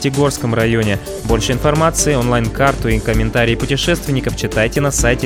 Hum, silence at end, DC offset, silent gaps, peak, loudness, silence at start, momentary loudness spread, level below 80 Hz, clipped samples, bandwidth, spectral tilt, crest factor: none; 0 s; under 0.1%; none; 0 dBFS; -15 LUFS; 0 s; 5 LU; -26 dBFS; under 0.1%; 18 kHz; -4.5 dB/octave; 14 dB